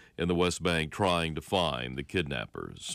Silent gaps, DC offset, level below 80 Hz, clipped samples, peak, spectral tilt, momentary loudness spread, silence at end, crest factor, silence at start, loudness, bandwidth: none; under 0.1%; -50 dBFS; under 0.1%; -16 dBFS; -4.5 dB/octave; 8 LU; 0 s; 16 dB; 0 s; -30 LUFS; 15.5 kHz